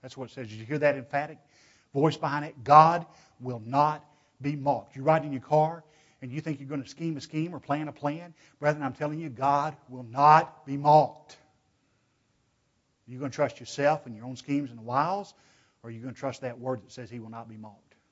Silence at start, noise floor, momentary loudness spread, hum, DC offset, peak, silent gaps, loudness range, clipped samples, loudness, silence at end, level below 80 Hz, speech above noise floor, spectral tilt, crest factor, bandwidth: 0.05 s; -72 dBFS; 20 LU; none; under 0.1%; -4 dBFS; none; 9 LU; under 0.1%; -27 LUFS; 0.4 s; -72 dBFS; 45 dB; -6.5 dB/octave; 26 dB; 8 kHz